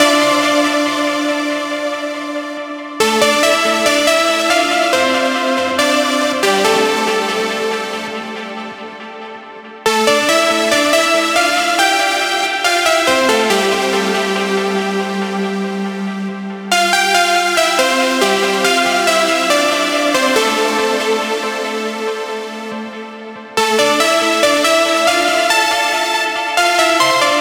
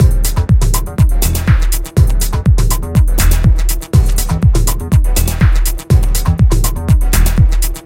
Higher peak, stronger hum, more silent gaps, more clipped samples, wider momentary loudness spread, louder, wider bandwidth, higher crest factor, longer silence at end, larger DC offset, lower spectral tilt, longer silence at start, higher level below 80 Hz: about the same, 0 dBFS vs 0 dBFS; neither; neither; neither; first, 12 LU vs 3 LU; about the same, -14 LUFS vs -13 LUFS; first, over 20 kHz vs 17 kHz; about the same, 14 dB vs 10 dB; about the same, 0 s vs 0.05 s; neither; second, -2 dB/octave vs -5.5 dB/octave; about the same, 0 s vs 0 s; second, -58 dBFS vs -12 dBFS